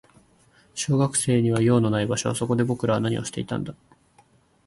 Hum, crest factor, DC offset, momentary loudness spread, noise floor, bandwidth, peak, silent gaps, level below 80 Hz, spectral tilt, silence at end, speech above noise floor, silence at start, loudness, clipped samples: none; 18 dB; under 0.1%; 11 LU; -59 dBFS; 12 kHz; -6 dBFS; none; -56 dBFS; -5.5 dB/octave; 0.95 s; 37 dB; 0.75 s; -23 LUFS; under 0.1%